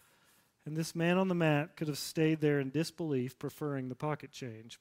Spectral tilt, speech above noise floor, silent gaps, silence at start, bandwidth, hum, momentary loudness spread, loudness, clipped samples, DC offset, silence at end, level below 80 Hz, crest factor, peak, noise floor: -6 dB/octave; 35 dB; none; 0.65 s; 16 kHz; none; 12 LU; -34 LUFS; under 0.1%; under 0.1%; 0.05 s; -74 dBFS; 18 dB; -16 dBFS; -69 dBFS